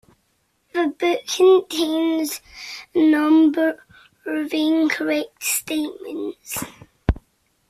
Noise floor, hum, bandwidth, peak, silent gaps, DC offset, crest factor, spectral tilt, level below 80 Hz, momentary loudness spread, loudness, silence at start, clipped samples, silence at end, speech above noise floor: -67 dBFS; none; 15.5 kHz; -4 dBFS; none; under 0.1%; 18 dB; -4.5 dB/octave; -40 dBFS; 16 LU; -20 LUFS; 0.75 s; under 0.1%; 0.55 s; 47 dB